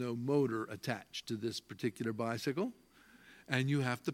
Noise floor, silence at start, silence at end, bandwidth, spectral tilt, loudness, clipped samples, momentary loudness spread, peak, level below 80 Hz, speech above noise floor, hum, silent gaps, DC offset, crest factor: -61 dBFS; 0 s; 0 s; 16.5 kHz; -6 dB/octave; -37 LUFS; under 0.1%; 8 LU; -14 dBFS; -78 dBFS; 25 dB; none; none; under 0.1%; 22 dB